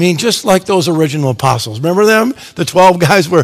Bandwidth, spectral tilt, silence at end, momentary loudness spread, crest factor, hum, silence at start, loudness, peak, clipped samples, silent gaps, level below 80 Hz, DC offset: 17.5 kHz; -5 dB/octave; 0 s; 6 LU; 10 dB; none; 0 s; -11 LUFS; 0 dBFS; 1%; none; -48 dBFS; under 0.1%